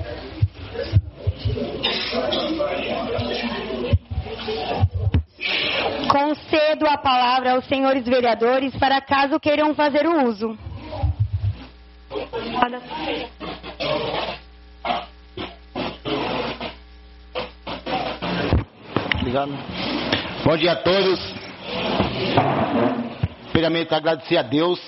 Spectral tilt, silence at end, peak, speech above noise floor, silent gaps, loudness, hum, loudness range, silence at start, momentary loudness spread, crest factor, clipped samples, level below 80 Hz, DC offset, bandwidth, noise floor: -4 dB/octave; 0 s; 0 dBFS; 24 dB; none; -22 LUFS; none; 9 LU; 0 s; 13 LU; 22 dB; under 0.1%; -38 dBFS; under 0.1%; 6 kHz; -44 dBFS